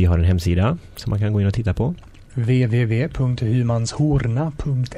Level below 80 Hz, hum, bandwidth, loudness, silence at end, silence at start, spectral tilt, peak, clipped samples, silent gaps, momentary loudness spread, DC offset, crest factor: -34 dBFS; none; 13.5 kHz; -20 LUFS; 0 s; 0 s; -7.5 dB/octave; -8 dBFS; under 0.1%; none; 7 LU; under 0.1%; 12 dB